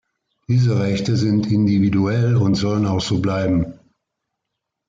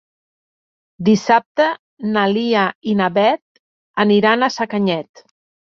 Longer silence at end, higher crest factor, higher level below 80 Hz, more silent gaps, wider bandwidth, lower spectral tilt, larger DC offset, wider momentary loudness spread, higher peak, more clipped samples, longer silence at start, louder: first, 1.15 s vs 0.7 s; about the same, 12 dB vs 16 dB; first, -48 dBFS vs -62 dBFS; second, none vs 1.46-1.55 s, 1.79-1.97 s, 2.75-2.81 s, 3.42-3.94 s; about the same, 7.6 kHz vs 7 kHz; first, -7 dB/octave vs -5.5 dB/octave; neither; second, 4 LU vs 8 LU; second, -8 dBFS vs -2 dBFS; neither; second, 0.5 s vs 1 s; about the same, -18 LUFS vs -17 LUFS